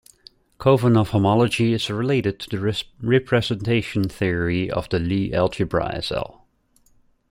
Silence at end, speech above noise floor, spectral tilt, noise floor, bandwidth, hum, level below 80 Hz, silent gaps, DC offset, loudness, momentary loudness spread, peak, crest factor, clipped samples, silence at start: 1 s; 40 dB; -6.5 dB/octave; -60 dBFS; 16 kHz; none; -46 dBFS; none; under 0.1%; -21 LUFS; 8 LU; -4 dBFS; 18 dB; under 0.1%; 0.6 s